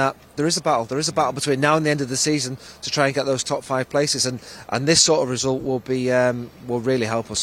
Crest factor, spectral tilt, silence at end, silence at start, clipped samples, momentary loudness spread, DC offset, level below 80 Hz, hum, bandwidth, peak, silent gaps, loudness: 18 dB; -3.5 dB/octave; 0 s; 0 s; under 0.1%; 8 LU; under 0.1%; -56 dBFS; none; 16.5 kHz; -4 dBFS; none; -21 LUFS